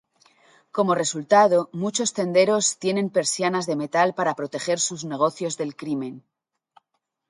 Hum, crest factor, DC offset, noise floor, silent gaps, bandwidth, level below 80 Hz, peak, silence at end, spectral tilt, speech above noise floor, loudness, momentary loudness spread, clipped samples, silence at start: none; 18 dB; under 0.1%; -78 dBFS; none; 11.5 kHz; -72 dBFS; -4 dBFS; 1.1 s; -3.5 dB/octave; 55 dB; -22 LUFS; 11 LU; under 0.1%; 0.75 s